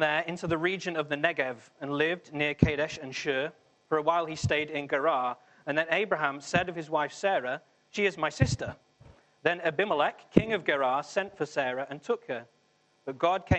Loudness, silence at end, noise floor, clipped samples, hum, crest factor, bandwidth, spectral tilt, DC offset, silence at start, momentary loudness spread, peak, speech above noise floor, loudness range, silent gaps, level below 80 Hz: -29 LUFS; 0 s; -68 dBFS; under 0.1%; none; 26 dB; 8.8 kHz; -5.5 dB/octave; under 0.1%; 0 s; 9 LU; -2 dBFS; 39 dB; 1 LU; none; -52 dBFS